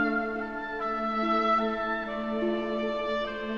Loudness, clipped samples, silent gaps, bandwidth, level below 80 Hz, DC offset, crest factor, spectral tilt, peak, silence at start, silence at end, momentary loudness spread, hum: -29 LUFS; under 0.1%; none; 7.2 kHz; -54 dBFS; 0.2%; 14 dB; -6 dB/octave; -14 dBFS; 0 s; 0 s; 7 LU; none